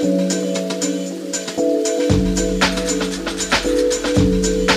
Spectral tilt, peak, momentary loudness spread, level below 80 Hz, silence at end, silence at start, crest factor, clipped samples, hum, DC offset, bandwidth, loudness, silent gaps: -4 dB/octave; 0 dBFS; 6 LU; -32 dBFS; 0 s; 0 s; 18 dB; under 0.1%; none; under 0.1%; 15.5 kHz; -18 LUFS; none